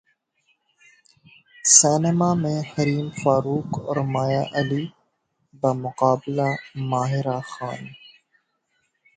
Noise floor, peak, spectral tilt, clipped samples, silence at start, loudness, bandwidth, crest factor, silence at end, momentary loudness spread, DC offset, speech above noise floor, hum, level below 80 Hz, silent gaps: -71 dBFS; 0 dBFS; -4.5 dB/octave; under 0.1%; 1.65 s; -21 LUFS; 9.6 kHz; 24 dB; 1.2 s; 15 LU; under 0.1%; 50 dB; none; -60 dBFS; none